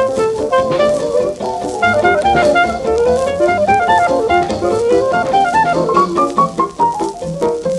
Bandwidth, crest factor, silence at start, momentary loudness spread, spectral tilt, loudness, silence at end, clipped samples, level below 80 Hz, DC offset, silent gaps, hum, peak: 12 kHz; 14 dB; 0 s; 6 LU; -5 dB/octave; -14 LUFS; 0 s; under 0.1%; -40 dBFS; under 0.1%; none; none; 0 dBFS